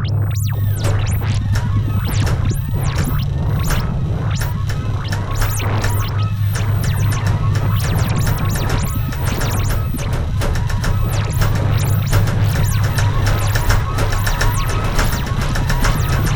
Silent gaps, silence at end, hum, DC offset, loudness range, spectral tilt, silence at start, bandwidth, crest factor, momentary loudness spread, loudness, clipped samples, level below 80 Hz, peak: none; 0 s; none; under 0.1%; 2 LU; -5.5 dB/octave; 0 s; over 20 kHz; 16 dB; 3 LU; -18 LUFS; under 0.1%; -22 dBFS; 0 dBFS